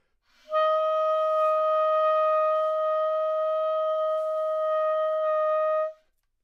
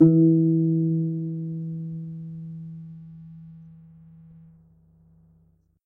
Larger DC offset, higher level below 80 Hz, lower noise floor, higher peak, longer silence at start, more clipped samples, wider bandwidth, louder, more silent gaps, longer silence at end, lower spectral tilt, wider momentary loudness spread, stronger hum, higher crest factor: neither; second, -74 dBFS vs -66 dBFS; about the same, -64 dBFS vs -62 dBFS; second, -16 dBFS vs -6 dBFS; first, 0.5 s vs 0 s; neither; first, 6 kHz vs 1.4 kHz; about the same, -25 LUFS vs -24 LUFS; neither; second, 0.5 s vs 2.15 s; second, -0.5 dB/octave vs -15 dB/octave; second, 4 LU vs 26 LU; neither; second, 10 dB vs 20 dB